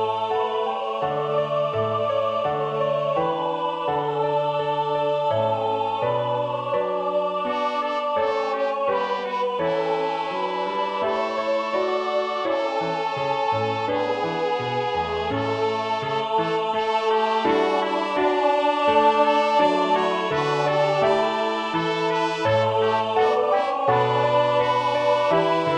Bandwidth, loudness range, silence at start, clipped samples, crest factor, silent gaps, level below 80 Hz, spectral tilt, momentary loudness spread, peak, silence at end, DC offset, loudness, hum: 9.4 kHz; 4 LU; 0 s; under 0.1%; 16 dB; none; -60 dBFS; -5.5 dB/octave; 5 LU; -6 dBFS; 0 s; under 0.1%; -22 LUFS; none